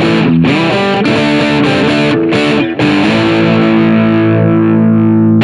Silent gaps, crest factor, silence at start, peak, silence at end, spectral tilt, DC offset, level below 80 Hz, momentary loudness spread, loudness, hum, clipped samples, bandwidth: none; 8 dB; 0 s; 0 dBFS; 0 s; -7 dB/octave; under 0.1%; -42 dBFS; 2 LU; -9 LUFS; none; under 0.1%; 10.5 kHz